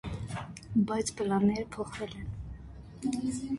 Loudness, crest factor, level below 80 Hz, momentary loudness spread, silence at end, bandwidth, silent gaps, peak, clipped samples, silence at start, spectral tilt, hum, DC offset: -33 LUFS; 16 dB; -50 dBFS; 16 LU; 0 s; 11.5 kHz; none; -16 dBFS; under 0.1%; 0.05 s; -6 dB/octave; none; under 0.1%